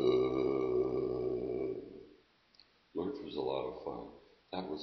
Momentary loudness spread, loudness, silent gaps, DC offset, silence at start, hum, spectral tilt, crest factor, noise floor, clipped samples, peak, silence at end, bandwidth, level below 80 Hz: 14 LU; -37 LUFS; none; under 0.1%; 0 s; none; -6 dB/octave; 18 dB; -67 dBFS; under 0.1%; -18 dBFS; 0 s; 6 kHz; -62 dBFS